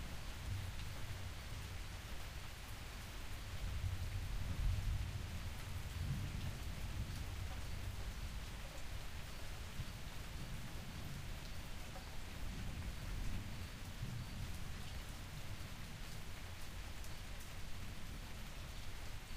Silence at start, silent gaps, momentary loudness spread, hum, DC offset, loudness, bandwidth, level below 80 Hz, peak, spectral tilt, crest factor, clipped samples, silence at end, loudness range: 0 s; none; 7 LU; none; under 0.1%; -48 LUFS; 15.5 kHz; -48 dBFS; -28 dBFS; -4.5 dB/octave; 18 dB; under 0.1%; 0 s; 6 LU